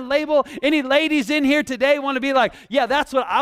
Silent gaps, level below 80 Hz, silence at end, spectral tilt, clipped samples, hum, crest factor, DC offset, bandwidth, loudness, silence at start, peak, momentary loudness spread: none; -54 dBFS; 0 s; -3.5 dB/octave; under 0.1%; none; 14 dB; under 0.1%; 15 kHz; -19 LUFS; 0 s; -4 dBFS; 3 LU